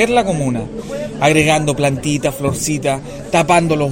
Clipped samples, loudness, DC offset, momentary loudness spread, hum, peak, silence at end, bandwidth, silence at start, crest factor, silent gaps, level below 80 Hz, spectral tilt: under 0.1%; -16 LUFS; under 0.1%; 11 LU; none; 0 dBFS; 0 s; 16.5 kHz; 0 s; 16 dB; none; -38 dBFS; -5 dB/octave